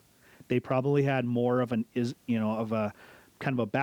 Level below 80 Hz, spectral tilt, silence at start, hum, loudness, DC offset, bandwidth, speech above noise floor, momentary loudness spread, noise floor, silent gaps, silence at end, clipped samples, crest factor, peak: -70 dBFS; -8 dB/octave; 0.5 s; none; -29 LUFS; under 0.1%; 17 kHz; 29 dB; 6 LU; -57 dBFS; none; 0 s; under 0.1%; 16 dB; -14 dBFS